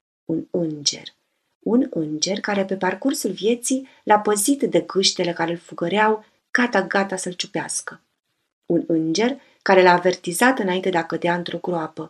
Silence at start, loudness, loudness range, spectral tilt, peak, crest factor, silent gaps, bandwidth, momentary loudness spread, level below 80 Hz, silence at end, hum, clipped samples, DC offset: 0.3 s; -21 LUFS; 4 LU; -3.5 dB/octave; 0 dBFS; 22 dB; 1.55-1.61 s, 8.53-8.62 s; 15 kHz; 9 LU; -74 dBFS; 0 s; none; under 0.1%; under 0.1%